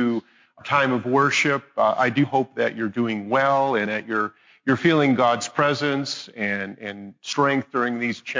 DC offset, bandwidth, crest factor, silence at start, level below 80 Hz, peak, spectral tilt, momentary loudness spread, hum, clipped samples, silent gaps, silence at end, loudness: under 0.1%; 7.6 kHz; 16 dB; 0 s; -66 dBFS; -6 dBFS; -5 dB/octave; 11 LU; none; under 0.1%; none; 0 s; -22 LUFS